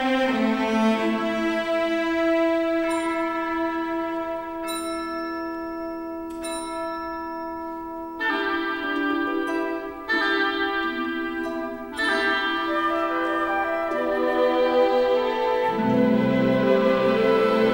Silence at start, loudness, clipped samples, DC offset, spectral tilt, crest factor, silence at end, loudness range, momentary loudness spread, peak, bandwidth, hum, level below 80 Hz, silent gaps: 0 s; -24 LUFS; under 0.1%; under 0.1%; -5 dB/octave; 16 dB; 0 s; 9 LU; 11 LU; -8 dBFS; 16 kHz; none; -54 dBFS; none